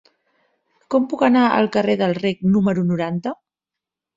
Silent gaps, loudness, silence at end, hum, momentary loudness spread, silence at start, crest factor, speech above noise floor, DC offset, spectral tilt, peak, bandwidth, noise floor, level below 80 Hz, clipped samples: none; -19 LUFS; 0.8 s; none; 10 LU; 0.9 s; 18 dB; 69 dB; under 0.1%; -8 dB/octave; -2 dBFS; 7.8 kHz; -86 dBFS; -58 dBFS; under 0.1%